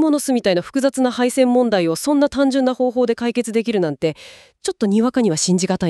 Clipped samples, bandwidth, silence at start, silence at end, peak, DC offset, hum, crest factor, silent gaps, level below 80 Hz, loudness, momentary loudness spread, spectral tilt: under 0.1%; 13.5 kHz; 0 s; 0 s; -4 dBFS; under 0.1%; none; 14 dB; none; -54 dBFS; -18 LUFS; 6 LU; -5 dB/octave